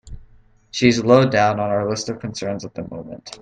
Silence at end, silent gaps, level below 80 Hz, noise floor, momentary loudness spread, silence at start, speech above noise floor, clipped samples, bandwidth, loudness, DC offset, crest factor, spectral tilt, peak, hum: 0.05 s; none; -46 dBFS; -50 dBFS; 18 LU; 0.05 s; 31 dB; under 0.1%; 9.4 kHz; -18 LUFS; under 0.1%; 20 dB; -5.5 dB/octave; 0 dBFS; none